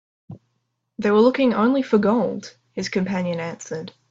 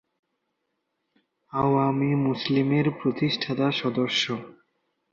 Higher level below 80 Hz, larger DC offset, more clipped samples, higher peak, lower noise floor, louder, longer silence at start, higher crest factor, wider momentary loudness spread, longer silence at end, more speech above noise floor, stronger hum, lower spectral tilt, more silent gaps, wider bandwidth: about the same, -62 dBFS vs -62 dBFS; neither; neither; first, -4 dBFS vs -10 dBFS; second, -74 dBFS vs -78 dBFS; first, -21 LUFS vs -25 LUFS; second, 0.3 s vs 1.55 s; about the same, 16 dB vs 16 dB; first, 16 LU vs 4 LU; second, 0.2 s vs 0.65 s; about the same, 53 dB vs 54 dB; neither; about the same, -6.5 dB/octave vs -6 dB/octave; neither; about the same, 7.8 kHz vs 7.6 kHz